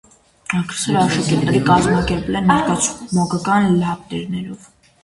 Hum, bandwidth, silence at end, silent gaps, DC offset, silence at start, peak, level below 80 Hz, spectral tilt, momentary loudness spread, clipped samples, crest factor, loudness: none; 11.5 kHz; 0.45 s; none; under 0.1%; 0.5 s; 0 dBFS; -40 dBFS; -5 dB/octave; 12 LU; under 0.1%; 18 dB; -17 LUFS